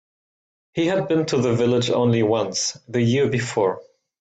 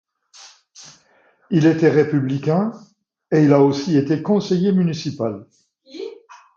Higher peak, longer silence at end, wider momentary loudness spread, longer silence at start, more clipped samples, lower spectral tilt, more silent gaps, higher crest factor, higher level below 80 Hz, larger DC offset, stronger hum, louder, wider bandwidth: second, -8 dBFS vs 0 dBFS; first, 0.4 s vs 0.2 s; second, 5 LU vs 18 LU; first, 0.75 s vs 0.4 s; neither; second, -5 dB/octave vs -7.5 dB/octave; neither; about the same, 14 dB vs 18 dB; first, -58 dBFS vs -64 dBFS; neither; neither; second, -21 LUFS vs -18 LUFS; first, 9.2 kHz vs 7.4 kHz